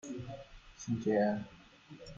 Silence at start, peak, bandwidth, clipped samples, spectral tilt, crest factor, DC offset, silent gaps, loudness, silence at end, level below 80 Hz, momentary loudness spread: 0.05 s; -20 dBFS; 7.6 kHz; under 0.1%; -6.5 dB/octave; 18 dB; under 0.1%; none; -35 LUFS; 0 s; -62 dBFS; 23 LU